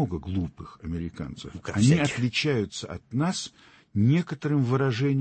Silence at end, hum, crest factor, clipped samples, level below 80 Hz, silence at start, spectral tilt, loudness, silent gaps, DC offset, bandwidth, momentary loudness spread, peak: 0 s; none; 18 dB; under 0.1%; -50 dBFS; 0 s; -6 dB/octave; -26 LUFS; none; under 0.1%; 8.8 kHz; 14 LU; -8 dBFS